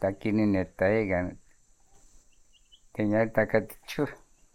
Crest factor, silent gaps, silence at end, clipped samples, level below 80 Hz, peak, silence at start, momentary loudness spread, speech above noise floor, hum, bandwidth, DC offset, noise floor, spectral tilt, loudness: 20 dB; none; 0.4 s; under 0.1%; -54 dBFS; -10 dBFS; 0 s; 10 LU; 33 dB; none; 17.5 kHz; under 0.1%; -60 dBFS; -7.5 dB/octave; -28 LUFS